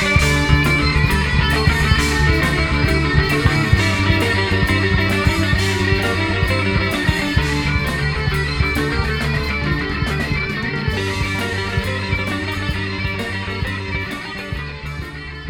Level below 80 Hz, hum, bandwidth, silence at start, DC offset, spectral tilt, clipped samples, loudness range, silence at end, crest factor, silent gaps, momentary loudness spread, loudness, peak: -26 dBFS; none; 19 kHz; 0 s; under 0.1%; -5 dB/octave; under 0.1%; 6 LU; 0 s; 18 dB; none; 8 LU; -18 LUFS; 0 dBFS